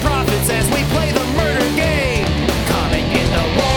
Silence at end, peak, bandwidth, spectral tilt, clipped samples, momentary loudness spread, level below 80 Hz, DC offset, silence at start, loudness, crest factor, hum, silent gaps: 0 s; 0 dBFS; 19 kHz; -4.5 dB/octave; under 0.1%; 1 LU; -24 dBFS; under 0.1%; 0 s; -16 LUFS; 16 dB; none; none